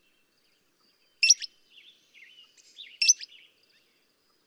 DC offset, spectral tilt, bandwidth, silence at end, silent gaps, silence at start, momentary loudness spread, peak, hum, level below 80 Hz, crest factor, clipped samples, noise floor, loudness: under 0.1%; 7.5 dB/octave; 15.5 kHz; 1.2 s; none; 1.2 s; 26 LU; -6 dBFS; none; under -90 dBFS; 26 dB; under 0.1%; -69 dBFS; -22 LUFS